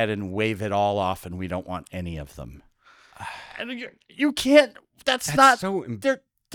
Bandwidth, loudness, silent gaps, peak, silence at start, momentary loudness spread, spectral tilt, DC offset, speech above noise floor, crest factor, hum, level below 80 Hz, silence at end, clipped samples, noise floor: 19 kHz; -23 LUFS; none; -2 dBFS; 0 s; 21 LU; -4.5 dB/octave; under 0.1%; 32 dB; 22 dB; none; -54 dBFS; 0.4 s; under 0.1%; -55 dBFS